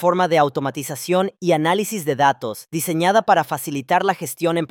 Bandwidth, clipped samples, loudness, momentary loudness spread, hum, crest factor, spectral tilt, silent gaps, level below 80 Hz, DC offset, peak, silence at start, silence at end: 18 kHz; under 0.1%; -20 LUFS; 9 LU; none; 18 dB; -4.5 dB/octave; none; -66 dBFS; under 0.1%; -2 dBFS; 0 s; 0.05 s